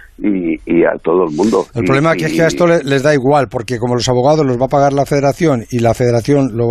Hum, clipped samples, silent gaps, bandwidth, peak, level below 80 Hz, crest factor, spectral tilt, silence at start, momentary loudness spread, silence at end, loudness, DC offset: none; under 0.1%; none; 14 kHz; -2 dBFS; -40 dBFS; 12 dB; -6.5 dB/octave; 0.2 s; 4 LU; 0 s; -13 LUFS; under 0.1%